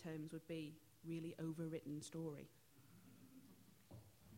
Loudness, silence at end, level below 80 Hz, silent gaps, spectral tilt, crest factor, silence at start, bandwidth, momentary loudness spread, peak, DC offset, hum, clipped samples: -51 LUFS; 0 s; -82 dBFS; none; -6.5 dB/octave; 16 dB; 0 s; 16.5 kHz; 19 LU; -36 dBFS; under 0.1%; none; under 0.1%